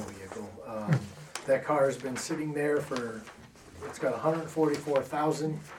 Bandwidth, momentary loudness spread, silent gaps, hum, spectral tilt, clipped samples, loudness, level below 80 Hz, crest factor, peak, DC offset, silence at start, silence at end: 17 kHz; 14 LU; none; none; -6 dB/octave; under 0.1%; -31 LUFS; -66 dBFS; 18 dB; -12 dBFS; under 0.1%; 0 s; 0 s